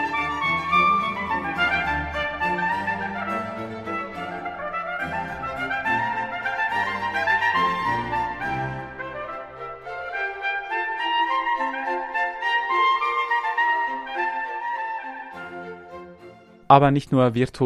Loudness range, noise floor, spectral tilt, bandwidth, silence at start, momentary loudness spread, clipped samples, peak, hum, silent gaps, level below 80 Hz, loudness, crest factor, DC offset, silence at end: 5 LU; -47 dBFS; -6 dB/octave; 14 kHz; 0 s; 13 LU; under 0.1%; 0 dBFS; none; none; -50 dBFS; -23 LUFS; 24 dB; under 0.1%; 0 s